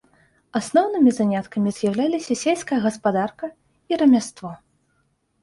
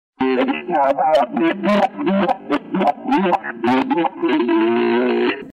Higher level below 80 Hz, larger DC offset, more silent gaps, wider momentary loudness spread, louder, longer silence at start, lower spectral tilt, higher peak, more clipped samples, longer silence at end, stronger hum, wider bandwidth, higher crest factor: about the same, -62 dBFS vs -58 dBFS; neither; neither; first, 15 LU vs 3 LU; second, -21 LUFS vs -18 LUFS; first, 0.55 s vs 0.2 s; second, -5.5 dB/octave vs -7 dB/octave; about the same, -6 dBFS vs -6 dBFS; neither; first, 0.85 s vs 0 s; neither; first, 11.5 kHz vs 8.4 kHz; first, 16 dB vs 10 dB